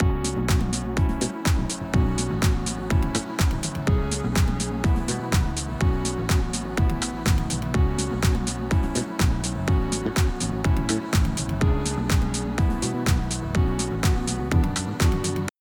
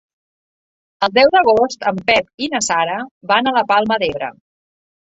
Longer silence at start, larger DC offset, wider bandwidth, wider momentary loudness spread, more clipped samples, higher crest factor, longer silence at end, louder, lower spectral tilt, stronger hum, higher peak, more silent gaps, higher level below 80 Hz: second, 0 s vs 1 s; neither; first, over 20 kHz vs 8 kHz; second, 3 LU vs 10 LU; neither; about the same, 16 dB vs 16 dB; second, 0.1 s vs 0.8 s; second, -24 LUFS vs -16 LUFS; first, -5 dB/octave vs -3 dB/octave; neither; second, -8 dBFS vs 0 dBFS; second, none vs 2.34-2.38 s, 3.11-3.21 s; first, -28 dBFS vs -54 dBFS